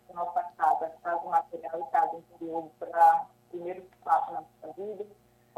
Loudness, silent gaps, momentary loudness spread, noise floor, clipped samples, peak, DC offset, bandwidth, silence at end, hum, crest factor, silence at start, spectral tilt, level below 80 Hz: -29 LUFS; none; 18 LU; -59 dBFS; under 0.1%; -10 dBFS; under 0.1%; 15 kHz; 0.5 s; none; 18 dB; 0.1 s; -5.5 dB/octave; -76 dBFS